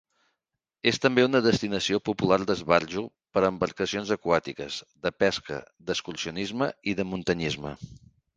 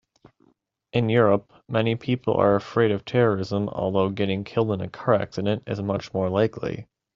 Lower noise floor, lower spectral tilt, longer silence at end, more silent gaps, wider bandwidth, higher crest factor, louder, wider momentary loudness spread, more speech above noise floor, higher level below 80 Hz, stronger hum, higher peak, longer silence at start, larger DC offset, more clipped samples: first, -85 dBFS vs -65 dBFS; about the same, -5 dB/octave vs -6 dB/octave; about the same, 0.4 s vs 0.3 s; neither; first, 9.8 kHz vs 7.4 kHz; about the same, 24 dB vs 20 dB; second, -27 LUFS vs -24 LUFS; first, 12 LU vs 7 LU; first, 58 dB vs 42 dB; about the same, -56 dBFS vs -58 dBFS; neither; about the same, -4 dBFS vs -4 dBFS; about the same, 0.85 s vs 0.95 s; neither; neither